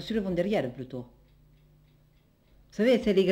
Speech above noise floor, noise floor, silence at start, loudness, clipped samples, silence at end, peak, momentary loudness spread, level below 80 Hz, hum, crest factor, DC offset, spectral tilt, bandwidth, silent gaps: 36 dB; -63 dBFS; 0 s; -28 LUFS; under 0.1%; 0 s; -12 dBFS; 19 LU; -56 dBFS; 50 Hz at -60 dBFS; 18 dB; under 0.1%; -7 dB/octave; 16 kHz; none